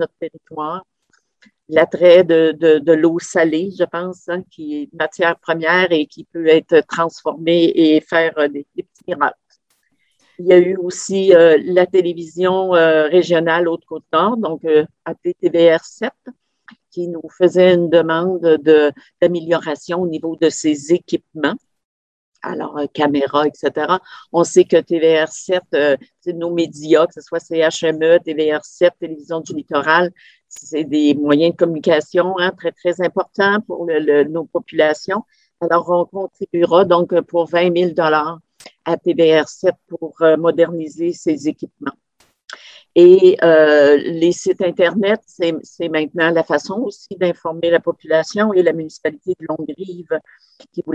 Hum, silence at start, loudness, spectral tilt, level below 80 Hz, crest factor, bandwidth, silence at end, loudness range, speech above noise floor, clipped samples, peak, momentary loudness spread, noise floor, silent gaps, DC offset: none; 0 s; -16 LUFS; -5.5 dB/octave; -64 dBFS; 16 dB; 9 kHz; 0 s; 5 LU; 49 dB; under 0.1%; 0 dBFS; 14 LU; -64 dBFS; 21.85-22.32 s; under 0.1%